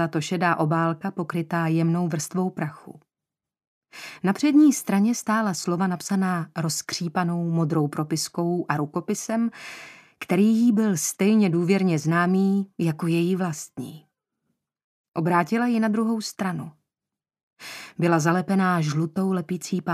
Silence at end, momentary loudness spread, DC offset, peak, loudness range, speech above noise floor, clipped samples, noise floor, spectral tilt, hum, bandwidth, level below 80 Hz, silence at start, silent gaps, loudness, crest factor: 0 s; 13 LU; under 0.1%; -4 dBFS; 5 LU; 66 dB; under 0.1%; -89 dBFS; -5.5 dB/octave; none; 15 kHz; -72 dBFS; 0 s; 3.67-3.82 s, 14.84-15.12 s, 17.43-17.51 s; -23 LUFS; 18 dB